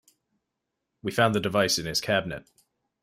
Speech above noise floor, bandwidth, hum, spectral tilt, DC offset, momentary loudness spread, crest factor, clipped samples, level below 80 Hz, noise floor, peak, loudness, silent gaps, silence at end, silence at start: 57 dB; 16 kHz; none; -3.5 dB/octave; under 0.1%; 14 LU; 20 dB; under 0.1%; -60 dBFS; -83 dBFS; -8 dBFS; -25 LUFS; none; 0.6 s; 1.05 s